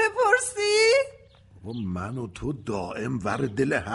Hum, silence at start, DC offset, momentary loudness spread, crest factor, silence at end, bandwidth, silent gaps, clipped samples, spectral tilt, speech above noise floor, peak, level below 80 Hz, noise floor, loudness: none; 0 s; under 0.1%; 14 LU; 18 dB; 0 s; 11.5 kHz; none; under 0.1%; -4 dB/octave; 23 dB; -6 dBFS; -54 dBFS; -52 dBFS; -25 LUFS